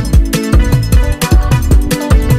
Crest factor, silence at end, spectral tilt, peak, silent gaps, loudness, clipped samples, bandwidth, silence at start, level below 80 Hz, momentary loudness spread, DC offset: 8 dB; 0 s; -6 dB/octave; 0 dBFS; none; -12 LUFS; under 0.1%; 15.5 kHz; 0 s; -12 dBFS; 1 LU; under 0.1%